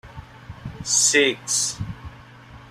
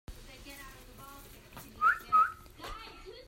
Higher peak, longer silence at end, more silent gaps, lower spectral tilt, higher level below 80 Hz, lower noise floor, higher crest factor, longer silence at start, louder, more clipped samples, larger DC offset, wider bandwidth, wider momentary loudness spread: first, -4 dBFS vs -16 dBFS; about the same, 0 s vs 0.05 s; neither; second, -1.5 dB/octave vs -3 dB/octave; first, -48 dBFS vs -54 dBFS; second, -44 dBFS vs -51 dBFS; about the same, 20 dB vs 18 dB; about the same, 0.05 s vs 0.1 s; first, -19 LUFS vs -28 LUFS; neither; neither; about the same, 15 kHz vs 16 kHz; about the same, 24 LU vs 24 LU